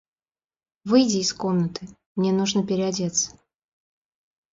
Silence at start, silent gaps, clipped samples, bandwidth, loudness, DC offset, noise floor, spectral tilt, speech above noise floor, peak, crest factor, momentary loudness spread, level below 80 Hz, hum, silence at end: 0.85 s; 2.06-2.15 s; under 0.1%; 7.8 kHz; -23 LUFS; under 0.1%; under -90 dBFS; -4.5 dB/octave; over 68 dB; -6 dBFS; 20 dB; 12 LU; -62 dBFS; none; 1.25 s